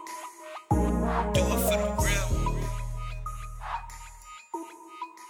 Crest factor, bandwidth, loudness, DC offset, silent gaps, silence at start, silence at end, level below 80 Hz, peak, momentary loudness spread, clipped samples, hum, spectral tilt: 18 dB; 19 kHz; -29 LUFS; under 0.1%; none; 0 s; 0 s; -34 dBFS; -12 dBFS; 18 LU; under 0.1%; none; -5 dB/octave